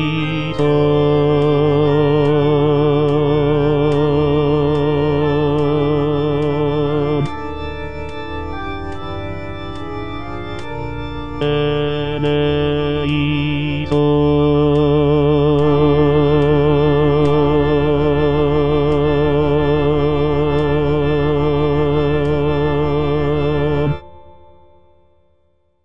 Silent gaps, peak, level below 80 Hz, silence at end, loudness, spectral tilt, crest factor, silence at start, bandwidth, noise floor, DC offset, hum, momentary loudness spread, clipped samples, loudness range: none; -4 dBFS; -32 dBFS; 0 s; -16 LUFS; -9 dB/octave; 12 dB; 0 s; 5.6 kHz; -62 dBFS; 3%; none; 13 LU; under 0.1%; 9 LU